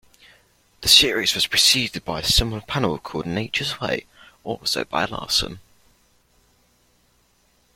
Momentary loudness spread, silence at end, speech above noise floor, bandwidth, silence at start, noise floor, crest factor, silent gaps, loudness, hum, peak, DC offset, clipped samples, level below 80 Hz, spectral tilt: 14 LU; 2.15 s; 40 dB; 16.5 kHz; 0.8 s; -62 dBFS; 24 dB; none; -19 LUFS; 60 Hz at -55 dBFS; 0 dBFS; under 0.1%; under 0.1%; -40 dBFS; -2 dB/octave